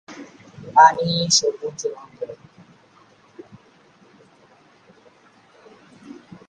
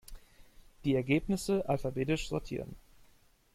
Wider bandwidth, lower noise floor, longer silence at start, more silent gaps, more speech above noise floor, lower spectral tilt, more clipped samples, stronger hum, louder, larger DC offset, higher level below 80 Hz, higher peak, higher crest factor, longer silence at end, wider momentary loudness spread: second, 10 kHz vs 16 kHz; second, -54 dBFS vs -64 dBFS; about the same, 0.1 s vs 0.1 s; neither; about the same, 35 dB vs 32 dB; second, -2.5 dB/octave vs -6 dB/octave; neither; neither; first, -17 LUFS vs -33 LUFS; neither; second, -66 dBFS vs -52 dBFS; first, 0 dBFS vs -14 dBFS; about the same, 24 dB vs 20 dB; second, 0.35 s vs 0.75 s; first, 30 LU vs 11 LU